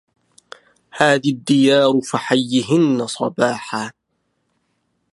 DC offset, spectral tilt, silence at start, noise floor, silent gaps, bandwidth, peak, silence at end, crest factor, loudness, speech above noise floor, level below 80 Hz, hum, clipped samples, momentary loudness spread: under 0.1%; -5 dB/octave; 0.95 s; -70 dBFS; none; 11.5 kHz; 0 dBFS; 1.25 s; 18 dB; -17 LUFS; 53 dB; -66 dBFS; none; under 0.1%; 12 LU